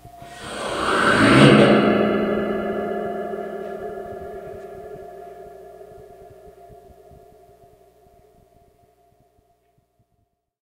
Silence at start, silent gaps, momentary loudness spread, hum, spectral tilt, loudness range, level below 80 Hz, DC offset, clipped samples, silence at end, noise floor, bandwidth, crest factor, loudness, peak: 0.05 s; none; 28 LU; none; -6 dB/octave; 24 LU; -50 dBFS; under 0.1%; under 0.1%; 4.35 s; -70 dBFS; 15 kHz; 22 dB; -18 LUFS; 0 dBFS